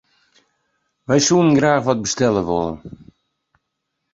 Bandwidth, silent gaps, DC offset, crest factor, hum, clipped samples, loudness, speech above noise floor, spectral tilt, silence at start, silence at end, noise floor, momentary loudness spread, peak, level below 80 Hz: 8 kHz; none; under 0.1%; 18 dB; none; under 0.1%; -17 LUFS; 59 dB; -4.5 dB/octave; 1.1 s; 1.25 s; -76 dBFS; 13 LU; -2 dBFS; -50 dBFS